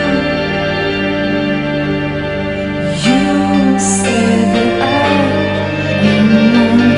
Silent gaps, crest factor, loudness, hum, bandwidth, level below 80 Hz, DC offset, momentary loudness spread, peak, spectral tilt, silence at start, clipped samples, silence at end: none; 12 dB; -13 LUFS; none; 11 kHz; -36 dBFS; under 0.1%; 8 LU; 0 dBFS; -5 dB/octave; 0 s; under 0.1%; 0 s